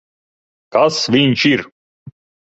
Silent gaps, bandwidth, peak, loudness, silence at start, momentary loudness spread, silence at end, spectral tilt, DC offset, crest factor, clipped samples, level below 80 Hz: 1.72-2.06 s; 8.2 kHz; -2 dBFS; -14 LUFS; 0.75 s; 7 LU; 0.3 s; -5 dB/octave; under 0.1%; 16 dB; under 0.1%; -56 dBFS